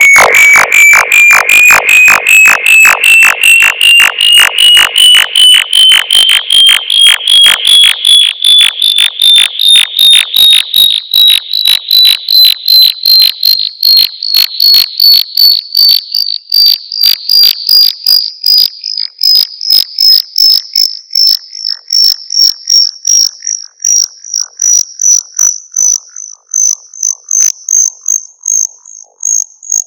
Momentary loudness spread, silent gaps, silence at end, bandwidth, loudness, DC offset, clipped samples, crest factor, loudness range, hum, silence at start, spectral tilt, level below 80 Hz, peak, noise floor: 8 LU; none; 0 s; over 20 kHz; -3 LUFS; under 0.1%; 8%; 6 dB; 7 LU; none; 0 s; 4 dB/octave; -52 dBFS; 0 dBFS; -33 dBFS